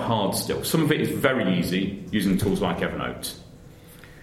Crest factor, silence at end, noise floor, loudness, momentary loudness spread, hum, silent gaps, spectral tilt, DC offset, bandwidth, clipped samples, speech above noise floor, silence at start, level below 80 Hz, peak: 20 dB; 0 s; -46 dBFS; -24 LUFS; 8 LU; none; none; -5 dB/octave; under 0.1%; 16 kHz; under 0.1%; 22 dB; 0 s; -46 dBFS; -4 dBFS